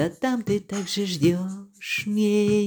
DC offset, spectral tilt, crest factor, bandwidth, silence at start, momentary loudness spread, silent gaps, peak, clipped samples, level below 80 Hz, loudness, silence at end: under 0.1%; -5.5 dB/octave; 14 dB; over 20 kHz; 0 s; 8 LU; none; -10 dBFS; under 0.1%; -60 dBFS; -24 LUFS; 0 s